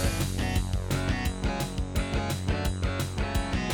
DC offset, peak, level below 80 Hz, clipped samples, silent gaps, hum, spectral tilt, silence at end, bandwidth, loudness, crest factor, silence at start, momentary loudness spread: under 0.1%; -14 dBFS; -34 dBFS; under 0.1%; none; none; -5 dB/octave; 0 s; 19 kHz; -30 LUFS; 14 dB; 0 s; 2 LU